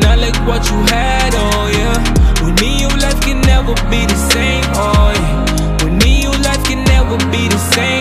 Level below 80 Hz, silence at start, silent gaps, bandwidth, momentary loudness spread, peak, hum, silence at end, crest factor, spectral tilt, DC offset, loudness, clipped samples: -14 dBFS; 0 s; none; 15.5 kHz; 3 LU; 0 dBFS; none; 0 s; 12 dB; -4.5 dB/octave; under 0.1%; -13 LUFS; under 0.1%